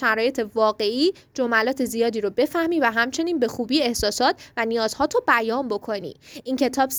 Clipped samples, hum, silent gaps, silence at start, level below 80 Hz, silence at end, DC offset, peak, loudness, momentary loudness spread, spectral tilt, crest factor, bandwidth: under 0.1%; none; none; 0 s; -52 dBFS; 0 s; under 0.1%; -4 dBFS; -22 LUFS; 7 LU; -3 dB/octave; 18 dB; over 20 kHz